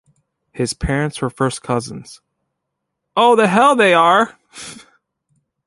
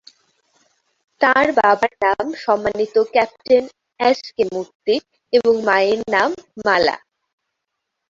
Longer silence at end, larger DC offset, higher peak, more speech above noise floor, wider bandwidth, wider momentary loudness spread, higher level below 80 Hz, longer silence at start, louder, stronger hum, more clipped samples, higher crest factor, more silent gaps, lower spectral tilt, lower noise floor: second, 0.9 s vs 1.1 s; neither; about the same, -2 dBFS vs -2 dBFS; about the same, 61 dB vs 61 dB; first, 11.5 kHz vs 7.6 kHz; first, 22 LU vs 7 LU; first, -40 dBFS vs -58 dBFS; second, 0.55 s vs 1.2 s; first, -15 LUFS vs -18 LUFS; neither; neither; about the same, 16 dB vs 18 dB; second, none vs 4.75-4.80 s; about the same, -4.5 dB/octave vs -4 dB/octave; about the same, -77 dBFS vs -78 dBFS